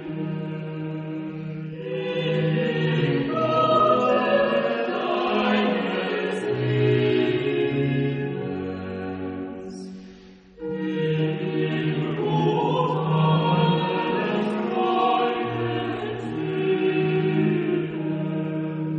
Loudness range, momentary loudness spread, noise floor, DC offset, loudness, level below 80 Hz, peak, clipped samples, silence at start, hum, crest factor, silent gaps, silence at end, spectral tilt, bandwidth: 6 LU; 11 LU; -47 dBFS; under 0.1%; -24 LUFS; -60 dBFS; -8 dBFS; under 0.1%; 0 s; none; 16 dB; none; 0 s; -8 dB/octave; 7.6 kHz